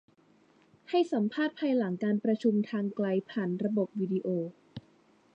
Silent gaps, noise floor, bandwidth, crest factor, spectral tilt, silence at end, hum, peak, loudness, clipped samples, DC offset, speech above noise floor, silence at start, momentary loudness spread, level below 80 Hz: none; -64 dBFS; 8 kHz; 16 dB; -8 dB/octave; 0.55 s; none; -16 dBFS; -31 LUFS; under 0.1%; under 0.1%; 34 dB; 0.9 s; 7 LU; -78 dBFS